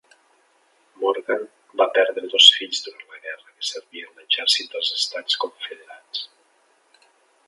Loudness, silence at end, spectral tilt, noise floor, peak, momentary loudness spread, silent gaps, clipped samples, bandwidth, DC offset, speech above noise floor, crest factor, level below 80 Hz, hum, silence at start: -19 LUFS; 1.2 s; 1.5 dB/octave; -62 dBFS; 0 dBFS; 25 LU; none; under 0.1%; 11.5 kHz; under 0.1%; 39 dB; 24 dB; -88 dBFS; none; 1 s